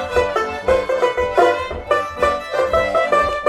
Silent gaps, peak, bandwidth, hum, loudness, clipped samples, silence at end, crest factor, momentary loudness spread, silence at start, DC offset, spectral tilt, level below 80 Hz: none; -2 dBFS; 13.5 kHz; none; -18 LUFS; under 0.1%; 0 s; 16 dB; 4 LU; 0 s; under 0.1%; -4.5 dB/octave; -38 dBFS